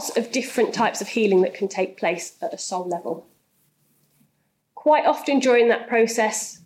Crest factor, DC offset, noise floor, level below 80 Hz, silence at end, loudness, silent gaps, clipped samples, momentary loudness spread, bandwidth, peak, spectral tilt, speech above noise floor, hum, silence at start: 16 dB; under 0.1%; -70 dBFS; -76 dBFS; 0.1 s; -22 LUFS; none; under 0.1%; 11 LU; 15.5 kHz; -8 dBFS; -3.5 dB/octave; 49 dB; none; 0 s